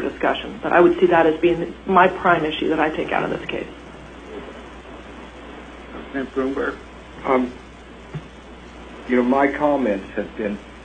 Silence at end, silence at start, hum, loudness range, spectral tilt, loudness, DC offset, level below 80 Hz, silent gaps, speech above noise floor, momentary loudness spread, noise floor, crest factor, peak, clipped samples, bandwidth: 0 s; 0 s; none; 12 LU; -6.5 dB/octave; -20 LUFS; under 0.1%; -46 dBFS; none; 21 dB; 23 LU; -40 dBFS; 20 dB; 0 dBFS; under 0.1%; 9 kHz